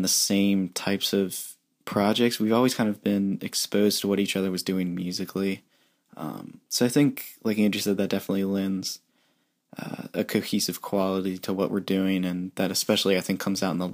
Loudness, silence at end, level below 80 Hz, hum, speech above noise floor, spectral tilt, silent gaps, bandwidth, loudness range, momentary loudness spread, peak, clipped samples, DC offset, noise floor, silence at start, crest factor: -25 LUFS; 0 s; -70 dBFS; none; 45 dB; -4.5 dB/octave; none; 15.5 kHz; 4 LU; 13 LU; -8 dBFS; under 0.1%; under 0.1%; -70 dBFS; 0 s; 18 dB